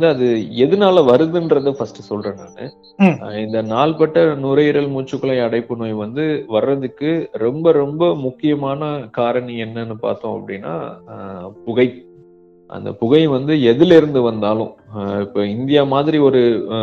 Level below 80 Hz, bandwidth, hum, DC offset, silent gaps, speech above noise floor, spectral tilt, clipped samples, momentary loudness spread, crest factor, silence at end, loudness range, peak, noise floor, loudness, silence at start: -56 dBFS; 7 kHz; none; under 0.1%; none; 30 dB; -8 dB/octave; under 0.1%; 15 LU; 16 dB; 0 s; 7 LU; 0 dBFS; -46 dBFS; -16 LUFS; 0 s